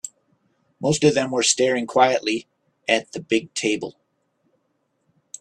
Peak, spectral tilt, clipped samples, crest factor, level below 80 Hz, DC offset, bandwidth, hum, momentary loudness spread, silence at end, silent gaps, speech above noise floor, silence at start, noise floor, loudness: -2 dBFS; -3.5 dB/octave; under 0.1%; 22 dB; -60 dBFS; under 0.1%; 12.5 kHz; none; 12 LU; 1.5 s; none; 50 dB; 0.05 s; -71 dBFS; -21 LUFS